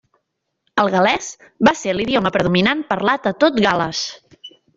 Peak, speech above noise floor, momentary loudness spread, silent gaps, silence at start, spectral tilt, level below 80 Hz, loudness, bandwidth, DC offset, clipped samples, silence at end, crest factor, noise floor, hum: -2 dBFS; 57 dB; 9 LU; none; 0.75 s; -4.5 dB/octave; -50 dBFS; -17 LUFS; 7.8 kHz; under 0.1%; under 0.1%; 0.3 s; 18 dB; -74 dBFS; none